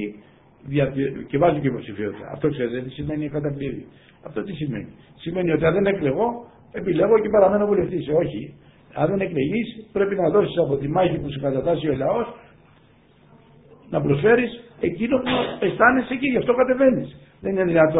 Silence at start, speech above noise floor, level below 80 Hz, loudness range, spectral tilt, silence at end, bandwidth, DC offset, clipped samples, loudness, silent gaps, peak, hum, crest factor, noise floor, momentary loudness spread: 0 s; 33 dB; -50 dBFS; 6 LU; -11.5 dB/octave; 0 s; 4 kHz; under 0.1%; under 0.1%; -22 LUFS; none; -2 dBFS; none; 20 dB; -54 dBFS; 14 LU